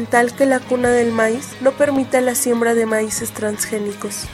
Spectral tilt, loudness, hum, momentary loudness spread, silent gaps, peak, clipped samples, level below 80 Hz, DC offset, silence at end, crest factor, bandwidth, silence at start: -3.5 dB/octave; -18 LUFS; none; 6 LU; none; 0 dBFS; under 0.1%; -50 dBFS; under 0.1%; 0 s; 18 dB; 16 kHz; 0 s